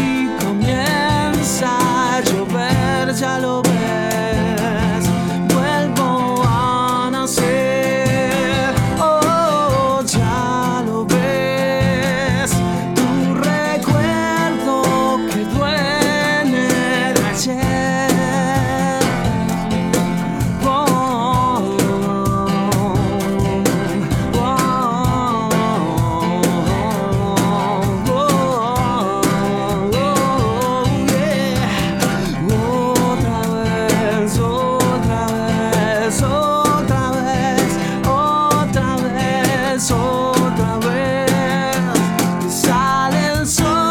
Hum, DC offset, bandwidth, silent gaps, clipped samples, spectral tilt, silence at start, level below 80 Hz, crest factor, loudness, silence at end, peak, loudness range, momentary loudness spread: none; under 0.1%; 19 kHz; none; under 0.1%; -5 dB/octave; 0 s; -34 dBFS; 16 dB; -17 LUFS; 0 s; 0 dBFS; 1 LU; 3 LU